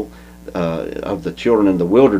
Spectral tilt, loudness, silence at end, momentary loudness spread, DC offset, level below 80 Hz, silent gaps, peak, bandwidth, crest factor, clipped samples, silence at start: -7.5 dB/octave; -17 LUFS; 0 s; 16 LU; under 0.1%; -42 dBFS; none; 0 dBFS; 15.5 kHz; 16 dB; under 0.1%; 0 s